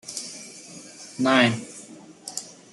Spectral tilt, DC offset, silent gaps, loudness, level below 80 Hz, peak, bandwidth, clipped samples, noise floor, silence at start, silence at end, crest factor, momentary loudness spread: -3.5 dB/octave; under 0.1%; none; -24 LUFS; -70 dBFS; -6 dBFS; 12 kHz; under 0.1%; -45 dBFS; 0.05 s; 0.2 s; 22 dB; 22 LU